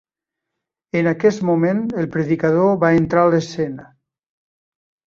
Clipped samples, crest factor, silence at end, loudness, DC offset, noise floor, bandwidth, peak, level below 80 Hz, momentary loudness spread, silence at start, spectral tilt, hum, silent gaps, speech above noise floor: under 0.1%; 16 dB; 1.2 s; -18 LUFS; under 0.1%; -83 dBFS; 7.4 kHz; -2 dBFS; -54 dBFS; 10 LU; 0.95 s; -7.5 dB/octave; none; none; 66 dB